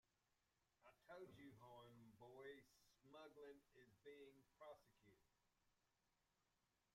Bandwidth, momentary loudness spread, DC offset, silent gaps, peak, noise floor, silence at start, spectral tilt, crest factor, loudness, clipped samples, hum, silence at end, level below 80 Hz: 15 kHz; 7 LU; under 0.1%; none; -50 dBFS; -89 dBFS; 0.05 s; -5.5 dB/octave; 18 dB; -65 LUFS; under 0.1%; none; 0.05 s; under -90 dBFS